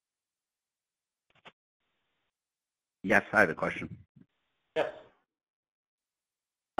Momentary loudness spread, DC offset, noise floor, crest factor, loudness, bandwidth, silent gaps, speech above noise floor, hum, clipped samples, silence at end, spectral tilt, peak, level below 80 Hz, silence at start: 16 LU; under 0.1%; under -90 dBFS; 28 dB; -29 LUFS; 10.5 kHz; 1.53-1.80 s, 4.09-4.15 s; over 61 dB; none; under 0.1%; 1.75 s; -5.5 dB/octave; -8 dBFS; -68 dBFS; 1.45 s